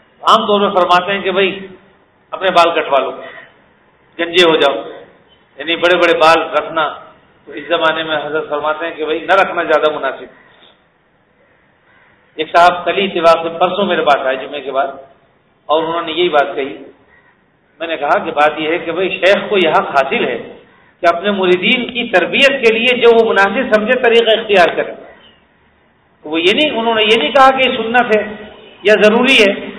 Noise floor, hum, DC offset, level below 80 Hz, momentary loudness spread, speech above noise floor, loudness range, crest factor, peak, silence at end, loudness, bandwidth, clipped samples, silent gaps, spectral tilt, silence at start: -55 dBFS; none; under 0.1%; -54 dBFS; 13 LU; 42 dB; 7 LU; 14 dB; 0 dBFS; 0 s; -12 LUFS; 11 kHz; 0.5%; none; -4.5 dB/octave; 0.2 s